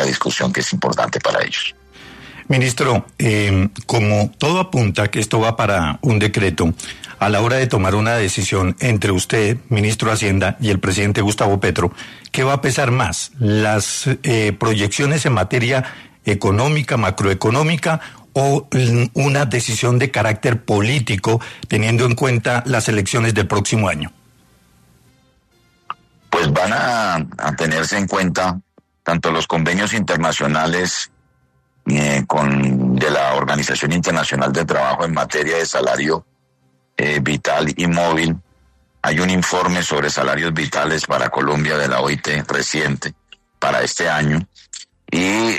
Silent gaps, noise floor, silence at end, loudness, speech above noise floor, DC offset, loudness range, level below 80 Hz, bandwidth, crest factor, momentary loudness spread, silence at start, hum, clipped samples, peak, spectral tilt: none; -61 dBFS; 0 s; -17 LUFS; 44 dB; under 0.1%; 2 LU; -44 dBFS; 13.5 kHz; 16 dB; 6 LU; 0 s; none; under 0.1%; -2 dBFS; -5 dB/octave